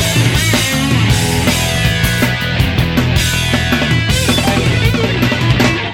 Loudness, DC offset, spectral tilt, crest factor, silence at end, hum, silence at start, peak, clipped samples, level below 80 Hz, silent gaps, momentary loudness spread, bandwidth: -13 LUFS; under 0.1%; -4.5 dB/octave; 12 dB; 0 s; none; 0 s; 0 dBFS; under 0.1%; -24 dBFS; none; 2 LU; 17 kHz